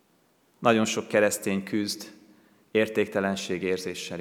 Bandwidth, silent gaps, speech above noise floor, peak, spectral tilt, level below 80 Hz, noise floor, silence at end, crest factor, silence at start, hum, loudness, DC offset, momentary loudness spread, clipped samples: 18 kHz; none; 39 dB; -4 dBFS; -4 dB/octave; -76 dBFS; -65 dBFS; 0 s; 24 dB; 0.6 s; none; -27 LUFS; under 0.1%; 8 LU; under 0.1%